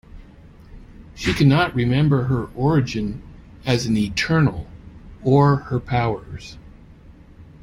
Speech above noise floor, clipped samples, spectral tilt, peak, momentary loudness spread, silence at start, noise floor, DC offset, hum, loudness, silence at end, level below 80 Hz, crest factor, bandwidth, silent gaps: 26 dB; under 0.1%; -6.5 dB/octave; -2 dBFS; 18 LU; 0.15 s; -45 dBFS; under 0.1%; none; -20 LUFS; 0.2 s; -42 dBFS; 18 dB; 12 kHz; none